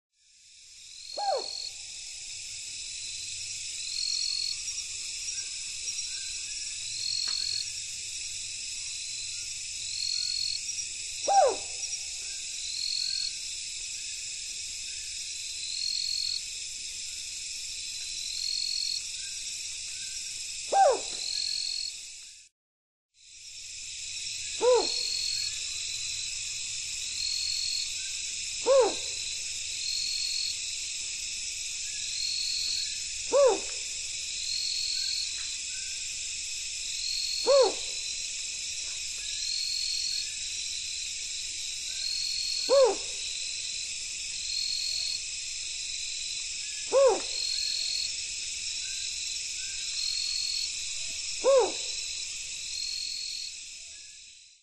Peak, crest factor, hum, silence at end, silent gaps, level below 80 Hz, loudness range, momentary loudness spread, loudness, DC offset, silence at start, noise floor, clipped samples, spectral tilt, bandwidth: -12 dBFS; 20 dB; none; 0.1 s; 22.52-23.09 s; -58 dBFS; 4 LU; 10 LU; -30 LUFS; under 0.1%; 0.45 s; -57 dBFS; under 0.1%; 1 dB/octave; 13.5 kHz